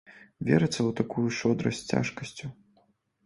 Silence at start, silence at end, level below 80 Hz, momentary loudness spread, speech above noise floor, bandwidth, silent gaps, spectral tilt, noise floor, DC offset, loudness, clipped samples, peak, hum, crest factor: 0.1 s; 0.7 s; -60 dBFS; 14 LU; 40 dB; 11.5 kHz; none; -6 dB/octave; -68 dBFS; under 0.1%; -28 LUFS; under 0.1%; -8 dBFS; none; 22 dB